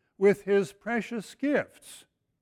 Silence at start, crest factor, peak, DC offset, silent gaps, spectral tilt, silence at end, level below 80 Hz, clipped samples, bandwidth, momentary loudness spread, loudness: 0.2 s; 18 dB; -12 dBFS; under 0.1%; none; -6 dB/octave; 0.45 s; -70 dBFS; under 0.1%; 15 kHz; 18 LU; -28 LUFS